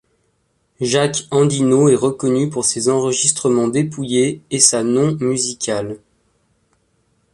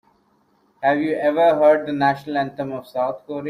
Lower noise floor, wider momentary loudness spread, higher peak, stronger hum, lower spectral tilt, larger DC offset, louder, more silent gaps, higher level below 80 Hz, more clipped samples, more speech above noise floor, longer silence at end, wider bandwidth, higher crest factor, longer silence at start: first, -65 dBFS vs -61 dBFS; about the same, 8 LU vs 10 LU; first, 0 dBFS vs -4 dBFS; neither; second, -4 dB/octave vs -7 dB/octave; neither; first, -16 LUFS vs -20 LUFS; neither; first, -56 dBFS vs -64 dBFS; neither; first, 48 dB vs 42 dB; first, 1.35 s vs 0 s; second, 11.5 kHz vs 14.5 kHz; about the same, 18 dB vs 16 dB; about the same, 0.8 s vs 0.8 s